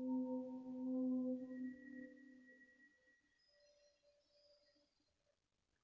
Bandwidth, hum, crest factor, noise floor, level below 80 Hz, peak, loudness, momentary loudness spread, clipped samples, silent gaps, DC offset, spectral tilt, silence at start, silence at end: 5.6 kHz; none; 14 dB; -87 dBFS; -90 dBFS; -34 dBFS; -46 LUFS; 22 LU; under 0.1%; none; under 0.1%; -6.5 dB/octave; 0 s; 2.95 s